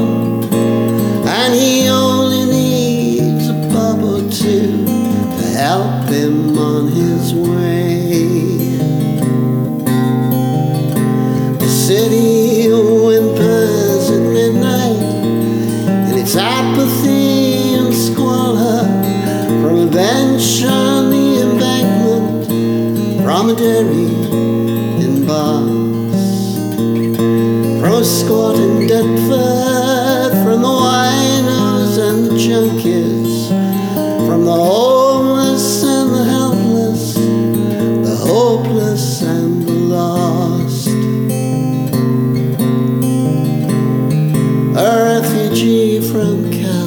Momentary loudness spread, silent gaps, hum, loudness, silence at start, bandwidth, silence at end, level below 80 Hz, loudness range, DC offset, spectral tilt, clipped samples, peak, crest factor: 4 LU; none; none; -13 LUFS; 0 s; over 20 kHz; 0 s; -50 dBFS; 2 LU; under 0.1%; -6 dB/octave; under 0.1%; 0 dBFS; 12 dB